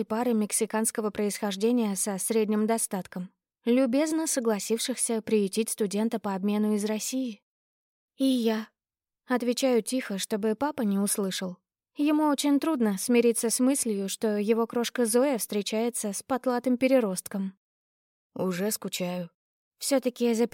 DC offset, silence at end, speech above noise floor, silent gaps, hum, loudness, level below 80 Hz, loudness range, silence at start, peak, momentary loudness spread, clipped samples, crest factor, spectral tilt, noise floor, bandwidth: under 0.1%; 0.05 s; over 63 dB; 7.42-8.08 s, 17.57-18.30 s, 19.34-19.71 s; none; -27 LUFS; -76 dBFS; 4 LU; 0 s; -12 dBFS; 9 LU; under 0.1%; 16 dB; -4 dB/octave; under -90 dBFS; 17 kHz